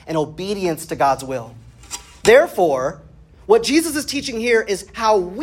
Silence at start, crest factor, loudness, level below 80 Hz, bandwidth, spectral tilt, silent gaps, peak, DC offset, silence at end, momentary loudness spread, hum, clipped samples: 0.05 s; 18 dB; -18 LUFS; -48 dBFS; 16.5 kHz; -4 dB/octave; none; 0 dBFS; under 0.1%; 0 s; 16 LU; none; under 0.1%